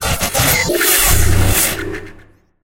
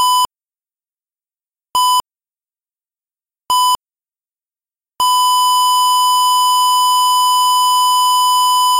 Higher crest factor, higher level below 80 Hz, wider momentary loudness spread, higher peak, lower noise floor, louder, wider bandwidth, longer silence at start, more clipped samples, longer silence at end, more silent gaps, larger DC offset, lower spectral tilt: first, 14 dB vs 6 dB; first, -22 dBFS vs -64 dBFS; first, 13 LU vs 6 LU; first, 0 dBFS vs -8 dBFS; second, -44 dBFS vs under -90 dBFS; about the same, -13 LUFS vs -12 LUFS; about the same, 17 kHz vs 16 kHz; about the same, 0 s vs 0 s; neither; first, 0.5 s vs 0 s; neither; neither; first, -3 dB/octave vs 3 dB/octave